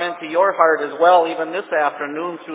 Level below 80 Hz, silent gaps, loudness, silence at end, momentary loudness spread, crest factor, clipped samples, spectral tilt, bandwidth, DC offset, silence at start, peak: -88 dBFS; none; -18 LUFS; 0 s; 11 LU; 18 dB; under 0.1%; -7.5 dB/octave; 4 kHz; under 0.1%; 0 s; 0 dBFS